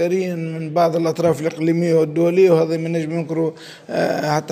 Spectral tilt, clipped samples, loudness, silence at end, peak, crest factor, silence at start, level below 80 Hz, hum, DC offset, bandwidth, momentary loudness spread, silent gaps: -7 dB/octave; under 0.1%; -19 LUFS; 0 s; -2 dBFS; 16 dB; 0 s; -64 dBFS; none; under 0.1%; 15.5 kHz; 9 LU; none